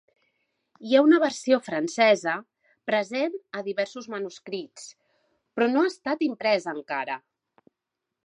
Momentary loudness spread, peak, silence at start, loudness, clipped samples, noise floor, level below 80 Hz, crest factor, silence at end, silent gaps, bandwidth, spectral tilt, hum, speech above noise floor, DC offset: 16 LU; -6 dBFS; 0.8 s; -25 LUFS; under 0.1%; -85 dBFS; -82 dBFS; 20 dB; 1.1 s; none; 10.5 kHz; -4 dB/octave; none; 60 dB; under 0.1%